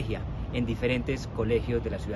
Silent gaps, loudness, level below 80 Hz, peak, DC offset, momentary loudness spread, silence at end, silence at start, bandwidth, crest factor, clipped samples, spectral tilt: none; -30 LUFS; -38 dBFS; -14 dBFS; under 0.1%; 6 LU; 0 s; 0 s; 12 kHz; 16 dB; under 0.1%; -7 dB/octave